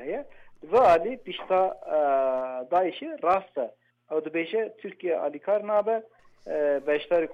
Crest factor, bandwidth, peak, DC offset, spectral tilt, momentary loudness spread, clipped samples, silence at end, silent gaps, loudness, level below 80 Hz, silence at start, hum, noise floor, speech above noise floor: 14 dB; 8.4 kHz; -12 dBFS; under 0.1%; -6 dB/octave; 12 LU; under 0.1%; 0 s; none; -26 LUFS; -62 dBFS; 0 s; none; -46 dBFS; 21 dB